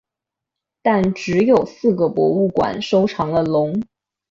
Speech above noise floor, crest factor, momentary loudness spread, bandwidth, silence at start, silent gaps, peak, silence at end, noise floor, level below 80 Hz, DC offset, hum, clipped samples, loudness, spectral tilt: 68 dB; 16 dB; 6 LU; 7.6 kHz; 0.85 s; none; -4 dBFS; 0.5 s; -85 dBFS; -52 dBFS; under 0.1%; none; under 0.1%; -18 LUFS; -7 dB/octave